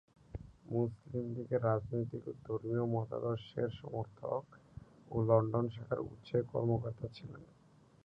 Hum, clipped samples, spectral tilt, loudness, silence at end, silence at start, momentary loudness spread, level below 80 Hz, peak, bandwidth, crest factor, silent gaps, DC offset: none; under 0.1%; -10 dB/octave; -37 LUFS; 0.6 s; 0.35 s; 18 LU; -62 dBFS; -14 dBFS; 5.6 kHz; 24 dB; none; under 0.1%